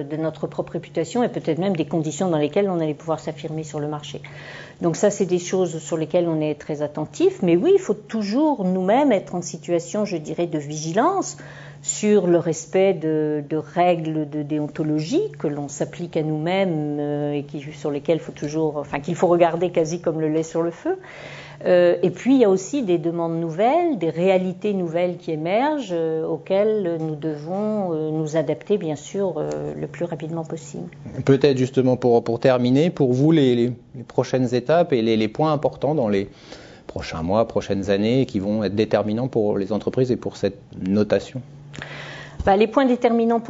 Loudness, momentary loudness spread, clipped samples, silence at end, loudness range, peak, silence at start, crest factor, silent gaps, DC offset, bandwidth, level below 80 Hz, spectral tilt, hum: -22 LUFS; 12 LU; under 0.1%; 0 s; 5 LU; -2 dBFS; 0 s; 18 dB; none; under 0.1%; 8 kHz; -52 dBFS; -6.5 dB/octave; none